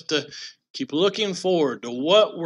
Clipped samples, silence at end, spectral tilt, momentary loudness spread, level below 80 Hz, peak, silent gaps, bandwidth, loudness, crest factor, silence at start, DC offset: under 0.1%; 0 s; -4 dB/octave; 18 LU; -78 dBFS; -4 dBFS; 0.70-0.74 s; 11 kHz; -22 LUFS; 18 dB; 0.1 s; under 0.1%